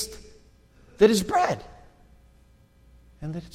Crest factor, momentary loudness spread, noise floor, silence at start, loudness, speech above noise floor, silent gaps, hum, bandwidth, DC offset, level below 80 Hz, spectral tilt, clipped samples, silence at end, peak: 22 dB; 19 LU; -57 dBFS; 0 s; -24 LUFS; 34 dB; none; none; 16 kHz; under 0.1%; -52 dBFS; -4.5 dB/octave; under 0.1%; 0.05 s; -6 dBFS